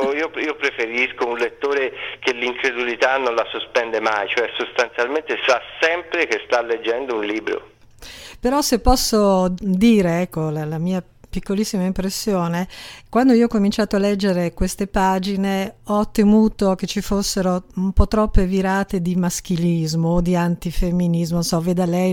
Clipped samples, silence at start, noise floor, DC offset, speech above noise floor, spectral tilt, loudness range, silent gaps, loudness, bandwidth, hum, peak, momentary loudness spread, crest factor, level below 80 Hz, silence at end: under 0.1%; 0 s; -40 dBFS; under 0.1%; 22 dB; -5.5 dB/octave; 2 LU; none; -20 LUFS; 17.5 kHz; none; 0 dBFS; 8 LU; 20 dB; -32 dBFS; 0 s